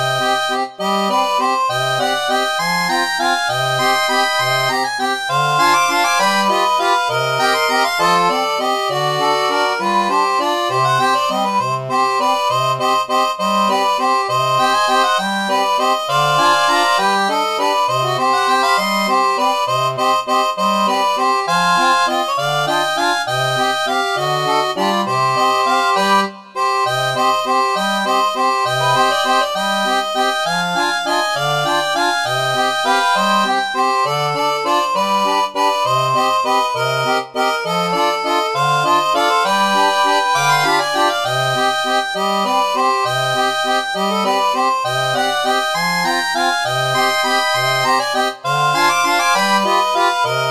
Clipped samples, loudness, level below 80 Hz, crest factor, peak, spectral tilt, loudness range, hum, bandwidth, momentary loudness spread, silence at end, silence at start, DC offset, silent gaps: under 0.1%; -15 LUFS; -64 dBFS; 14 dB; -2 dBFS; -3 dB/octave; 2 LU; none; 14 kHz; 3 LU; 0 s; 0 s; 0.3%; none